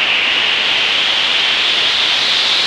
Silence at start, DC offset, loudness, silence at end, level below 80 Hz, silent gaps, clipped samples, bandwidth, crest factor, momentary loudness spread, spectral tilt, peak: 0 s; under 0.1%; -11 LUFS; 0 s; -52 dBFS; none; under 0.1%; 15 kHz; 12 dB; 1 LU; 0.5 dB/octave; -2 dBFS